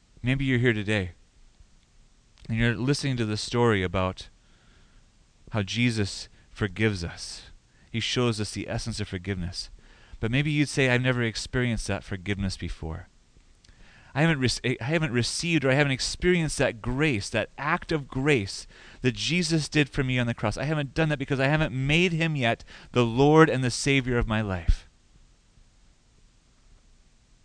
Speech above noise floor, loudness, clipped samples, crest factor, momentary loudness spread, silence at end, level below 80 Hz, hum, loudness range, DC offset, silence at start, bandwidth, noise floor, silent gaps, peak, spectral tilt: 33 dB; -26 LUFS; under 0.1%; 24 dB; 12 LU; 2.6 s; -40 dBFS; none; 7 LU; under 0.1%; 0.25 s; 10.5 kHz; -59 dBFS; none; -4 dBFS; -5 dB/octave